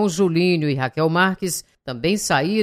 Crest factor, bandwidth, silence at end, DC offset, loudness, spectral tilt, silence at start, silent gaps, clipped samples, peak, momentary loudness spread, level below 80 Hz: 16 dB; 16 kHz; 0 s; under 0.1%; -20 LUFS; -5 dB/octave; 0 s; none; under 0.1%; -4 dBFS; 8 LU; -52 dBFS